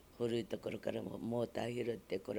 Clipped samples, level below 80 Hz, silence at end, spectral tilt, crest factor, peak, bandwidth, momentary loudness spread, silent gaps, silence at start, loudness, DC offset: under 0.1%; -68 dBFS; 0 s; -6.5 dB/octave; 16 dB; -24 dBFS; over 20 kHz; 4 LU; none; 0 s; -41 LUFS; under 0.1%